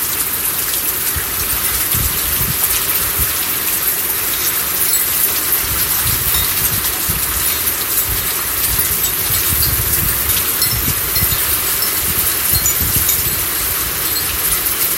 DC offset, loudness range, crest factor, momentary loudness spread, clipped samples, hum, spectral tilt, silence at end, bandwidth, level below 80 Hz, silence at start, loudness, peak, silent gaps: under 0.1%; 1 LU; 16 dB; 3 LU; under 0.1%; none; -1 dB/octave; 0 s; 16.5 kHz; -32 dBFS; 0 s; -13 LUFS; 0 dBFS; none